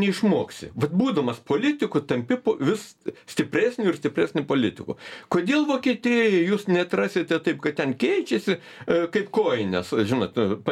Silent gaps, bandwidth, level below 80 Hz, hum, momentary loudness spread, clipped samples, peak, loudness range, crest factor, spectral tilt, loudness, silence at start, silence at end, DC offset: none; 15 kHz; -64 dBFS; none; 7 LU; under 0.1%; -6 dBFS; 2 LU; 16 dB; -6 dB/octave; -24 LUFS; 0 s; 0 s; under 0.1%